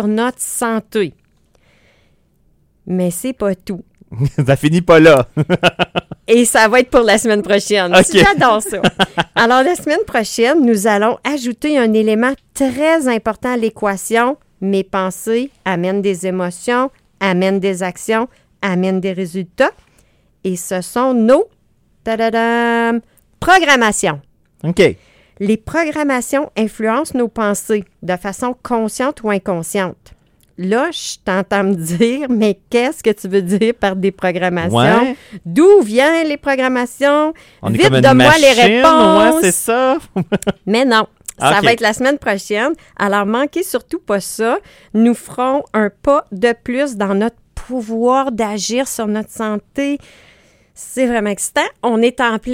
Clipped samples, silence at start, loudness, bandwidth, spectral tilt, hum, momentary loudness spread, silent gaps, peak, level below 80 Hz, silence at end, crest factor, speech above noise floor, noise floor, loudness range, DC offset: under 0.1%; 0 s; -14 LUFS; 16.5 kHz; -4.5 dB/octave; none; 12 LU; none; 0 dBFS; -44 dBFS; 0 s; 14 dB; 41 dB; -55 dBFS; 8 LU; under 0.1%